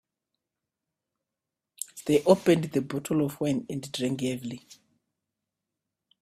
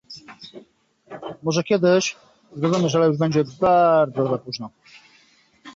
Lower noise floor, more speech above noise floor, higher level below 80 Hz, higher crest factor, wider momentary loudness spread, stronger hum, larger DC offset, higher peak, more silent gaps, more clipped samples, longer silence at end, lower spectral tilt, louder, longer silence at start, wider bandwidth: first, -88 dBFS vs -57 dBFS; first, 62 dB vs 37 dB; about the same, -66 dBFS vs -62 dBFS; first, 24 dB vs 16 dB; second, 17 LU vs 24 LU; neither; neither; about the same, -6 dBFS vs -6 dBFS; neither; neither; first, 1.65 s vs 0.05 s; about the same, -6 dB/octave vs -5.5 dB/octave; second, -27 LUFS vs -20 LUFS; first, 1.8 s vs 0.1 s; first, 15.5 kHz vs 7.8 kHz